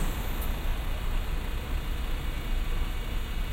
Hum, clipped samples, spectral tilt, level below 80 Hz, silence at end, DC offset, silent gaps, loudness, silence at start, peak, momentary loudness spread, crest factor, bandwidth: none; under 0.1%; -5 dB/octave; -30 dBFS; 0 s; under 0.1%; none; -35 LUFS; 0 s; -18 dBFS; 1 LU; 12 dB; 16 kHz